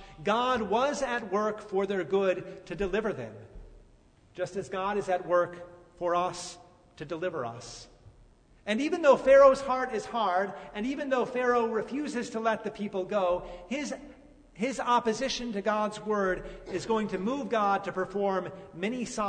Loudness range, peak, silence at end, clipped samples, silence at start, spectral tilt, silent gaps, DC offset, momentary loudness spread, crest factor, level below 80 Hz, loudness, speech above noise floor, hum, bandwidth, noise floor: 8 LU; -8 dBFS; 0 s; under 0.1%; 0 s; -4.5 dB/octave; none; under 0.1%; 11 LU; 22 dB; -56 dBFS; -29 LUFS; 31 dB; none; 9.6 kHz; -59 dBFS